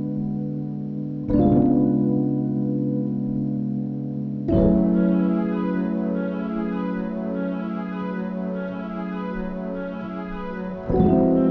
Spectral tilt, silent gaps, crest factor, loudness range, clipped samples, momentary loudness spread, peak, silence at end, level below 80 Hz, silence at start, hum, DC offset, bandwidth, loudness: -9.5 dB/octave; none; 18 dB; 6 LU; under 0.1%; 12 LU; -4 dBFS; 0 s; -40 dBFS; 0 s; none; under 0.1%; 4.6 kHz; -24 LUFS